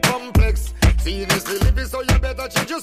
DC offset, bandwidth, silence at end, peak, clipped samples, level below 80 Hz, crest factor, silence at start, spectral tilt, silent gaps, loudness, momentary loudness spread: under 0.1%; 15.5 kHz; 0 s; -6 dBFS; under 0.1%; -20 dBFS; 12 dB; 0 s; -4.5 dB/octave; none; -20 LUFS; 4 LU